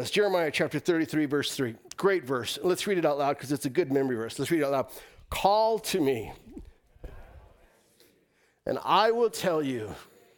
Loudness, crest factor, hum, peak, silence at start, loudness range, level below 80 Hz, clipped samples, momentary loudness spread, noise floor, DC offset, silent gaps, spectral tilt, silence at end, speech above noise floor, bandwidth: -27 LUFS; 20 dB; none; -10 dBFS; 0 s; 4 LU; -56 dBFS; under 0.1%; 13 LU; -68 dBFS; under 0.1%; none; -4.5 dB/octave; 0.35 s; 41 dB; 19 kHz